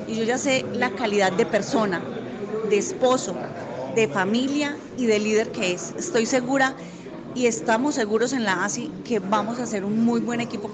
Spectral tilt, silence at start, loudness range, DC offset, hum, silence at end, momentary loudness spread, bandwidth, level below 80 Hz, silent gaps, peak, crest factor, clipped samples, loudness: -4 dB/octave; 0 s; 1 LU; under 0.1%; none; 0 s; 9 LU; 9.4 kHz; -62 dBFS; none; -8 dBFS; 16 dB; under 0.1%; -24 LUFS